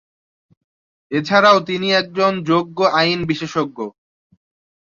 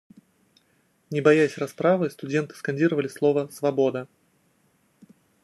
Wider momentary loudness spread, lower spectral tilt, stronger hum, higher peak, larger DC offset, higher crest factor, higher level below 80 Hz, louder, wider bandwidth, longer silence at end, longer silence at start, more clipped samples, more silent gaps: about the same, 12 LU vs 10 LU; second, -5 dB/octave vs -6.5 dB/octave; neither; about the same, -2 dBFS vs -4 dBFS; neither; about the same, 18 dB vs 22 dB; first, -56 dBFS vs -74 dBFS; first, -17 LUFS vs -24 LUFS; second, 7.6 kHz vs 12.5 kHz; second, 1 s vs 1.4 s; about the same, 1.1 s vs 1.1 s; neither; neither